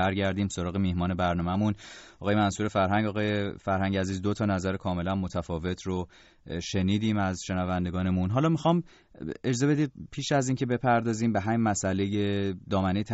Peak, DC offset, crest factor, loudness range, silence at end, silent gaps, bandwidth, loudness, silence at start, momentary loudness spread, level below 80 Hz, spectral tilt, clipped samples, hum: -12 dBFS; under 0.1%; 16 dB; 3 LU; 0 s; none; 8 kHz; -28 LUFS; 0 s; 8 LU; -52 dBFS; -6 dB/octave; under 0.1%; none